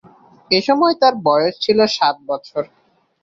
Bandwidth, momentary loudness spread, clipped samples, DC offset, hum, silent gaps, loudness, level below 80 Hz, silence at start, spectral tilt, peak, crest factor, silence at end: 7.8 kHz; 12 LU; under 0.1%; under 0.1%; none; none; -16 LUFS; -62 dBFS; 0.5 s; -4.5 dB/octave; -2 dBFS; 16 dB; 0.55 s